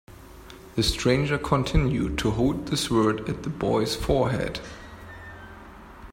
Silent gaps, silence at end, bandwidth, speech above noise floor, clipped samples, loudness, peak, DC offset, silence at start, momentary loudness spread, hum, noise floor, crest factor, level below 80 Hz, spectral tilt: none; 0 s; 16 kHz; 21 dB; under 0.1%; -25 LUFS; -6 dBFS; under 0.1%; 0.1 s; 21 LU; none; -45 dBFS; 20 dB; -38 dBFS; -5.5 dB/octave